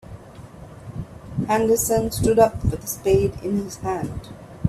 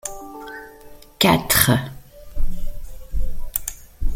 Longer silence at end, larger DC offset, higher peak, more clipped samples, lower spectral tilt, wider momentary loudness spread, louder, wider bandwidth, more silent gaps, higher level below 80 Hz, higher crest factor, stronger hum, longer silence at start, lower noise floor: about the same, 0 s vs 0 s; neither; second, -4 dBFS vs 0 dBFS; neither; first, -5.5 dB/octave vs -3.5 dB/octave; about the same, 23 LU vs 23 LU; about the same, -21 LUFS vs -20 LUFS; about the same, 16 kHz vs 17 kHz; neither; second, -40 dBFS vs -28 dBFS; about the same, 20 dB vs 20 dB; neither; about the same, 0.05 s vs 0.05 s; about the same, -41 dBFS vs -43 dBFS